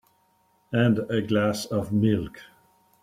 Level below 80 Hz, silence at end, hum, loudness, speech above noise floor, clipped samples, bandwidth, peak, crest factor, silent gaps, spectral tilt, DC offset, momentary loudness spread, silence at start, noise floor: -56 dBFS; 0.6 s; none; -25 LUFS; 42 dB; under 0.1%; 15 kHz; -8 dBFS; 18 dB; none; -6.5 dB/octave; under 0.1%; 6 LU; 0.7 s; -66 dBFS